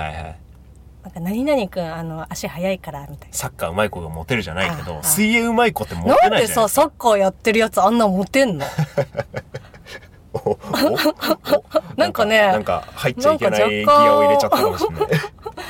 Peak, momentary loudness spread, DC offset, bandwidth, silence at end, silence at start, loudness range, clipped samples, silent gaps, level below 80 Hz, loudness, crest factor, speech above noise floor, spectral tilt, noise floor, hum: -4 dBFS; 16 LU; under 0.1%; 17 kHz; 0 s; 0 s; 8 LU; under 0.1%; none; -44 dBFS; -18 LUFS; 16 dB; 25 dB; -4.5 dB/octave; -43 dBFS; none